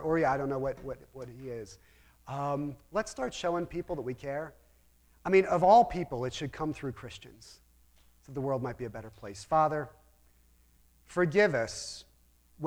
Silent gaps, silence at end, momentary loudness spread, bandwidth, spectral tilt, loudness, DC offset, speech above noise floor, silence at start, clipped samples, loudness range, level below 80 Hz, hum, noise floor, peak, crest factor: none; 0 s; 20 LU; 17.5 kHz; -5.5 dB/octave; -31 LUFS; under 0.1%; 33 dB; 0 s; under 0.1%; 8 LU; -56 dBFS; none; -64 dBFS; -10 dBFS; 22 dB